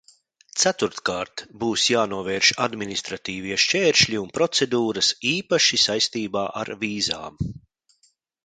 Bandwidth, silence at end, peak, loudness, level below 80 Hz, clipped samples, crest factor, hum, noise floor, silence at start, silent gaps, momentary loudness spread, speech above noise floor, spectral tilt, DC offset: 11 kHz; 0.85 s; -2 dBFS; -21 LUFS; -52 dBFS; under 0.1%; 22 dB; none; -65 dBFS; 0.55 s; none; 12 LU; 42 dB; -2.5 dB/octave; under 0.1%